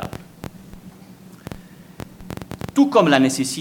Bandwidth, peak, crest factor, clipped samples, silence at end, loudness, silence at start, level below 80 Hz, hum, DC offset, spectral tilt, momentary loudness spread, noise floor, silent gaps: 17.5 kHz; 0 dBFS; 22 dB; under 0.1%; 0 s; -17 LUFS; 0 s; -48 dBFS; none; under 0.1%; -4.5 dB/octave; 25 LU; -43 dBFS; none